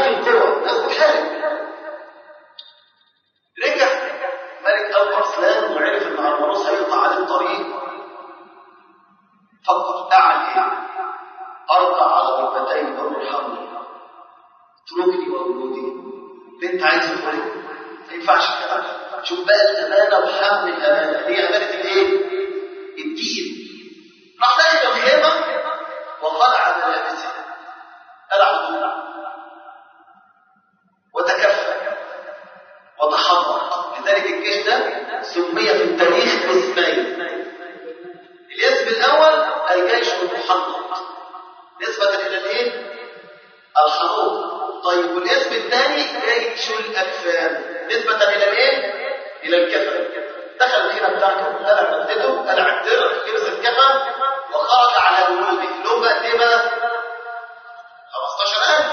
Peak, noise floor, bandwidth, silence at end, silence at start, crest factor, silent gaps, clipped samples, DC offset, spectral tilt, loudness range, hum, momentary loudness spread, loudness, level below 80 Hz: -2 dBFS; -65 dBFS; 6.8 kHz; 0 s; 0 s; 18 dB; none; under 0.1%; under 0.1%; -2 dB/octave; 7 LU; none; 17 LU; -18 LUFS; -78 dBFS